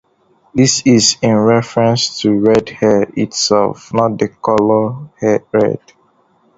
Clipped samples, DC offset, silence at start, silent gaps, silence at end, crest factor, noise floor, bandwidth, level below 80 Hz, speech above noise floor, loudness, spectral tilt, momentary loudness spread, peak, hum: under 0.1%; under 0.1%; 0.55 s; none; 0.8 s; 14 dB; -55 dBFS; 8 kHz; -48 dBFS; 42 dB; -13 LUFS; -4.5 dB/octave; 8 LU; 0 dBFS; none